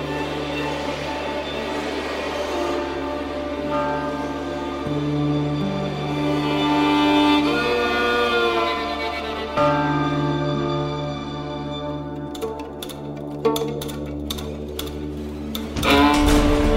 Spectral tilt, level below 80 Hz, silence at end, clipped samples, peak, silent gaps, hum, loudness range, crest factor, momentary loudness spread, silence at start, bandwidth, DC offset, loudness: -5.5 dB/octave; -34 dBFS; 0 s; under 0.1%; -4 dBFS; none; none; 8 LU; 18 dB; 12 LU; 0 s; 16 kHz; under 0.1%; -23 LUFS